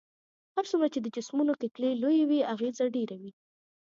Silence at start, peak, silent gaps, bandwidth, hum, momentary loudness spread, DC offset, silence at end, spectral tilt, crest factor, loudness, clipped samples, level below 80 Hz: 0.55 s; -14 dBFS; none; 7.6 kHz; none; 10 LU; under 0.1%; 0.55 s; -5.5 dB/octave; 16 dB; -30 LUFS; under 0.1%; -84 dBFS